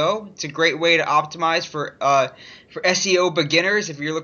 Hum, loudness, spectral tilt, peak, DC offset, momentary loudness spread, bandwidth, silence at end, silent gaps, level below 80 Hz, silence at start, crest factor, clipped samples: none; -19 LUFS; -3 dB/octave; -4 dBFS; under 0.1%; 10 LU; 7.4 kHz; 0 s; none; -68 dBFS; 0 s; 16 dB; under 0.1%